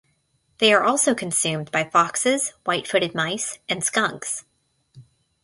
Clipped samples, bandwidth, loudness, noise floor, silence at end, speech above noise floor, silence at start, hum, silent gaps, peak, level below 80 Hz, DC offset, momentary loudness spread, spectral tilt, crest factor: under 0.1%; 12 kHz; -21 LUFS; -67 dBFS; 0.4 s; 45 dB; 0.6 s; none; none; -4 dBFS; -66 dBFS; under 0.1%; 9 LU; -2.5 dB/octave; 20 dB